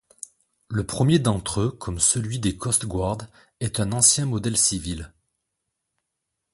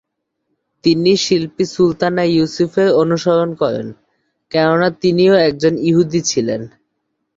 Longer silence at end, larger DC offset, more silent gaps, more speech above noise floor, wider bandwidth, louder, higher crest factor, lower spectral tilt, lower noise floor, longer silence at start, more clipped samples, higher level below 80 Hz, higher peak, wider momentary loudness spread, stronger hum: first, 1.45 s vs 0.7 s; neither; neither; about the same, 58 dB vs 58 dB; first, 12 kHz vs 7.8 kHz; second, -22 LUFS vs -15 LUFS; first, 22 dB vs 14 dB; second, -4 dB/octave vs -5.5 dB/octave; first, -81 dBFS vs -72 dBFS; second, 0.7 s vs 0.85 s; neither; first, -44 dBFS vs -52 dBFS; about the same, -4 dBFS vs -2 dBFS; first, 16 LU vs 8 LU; neither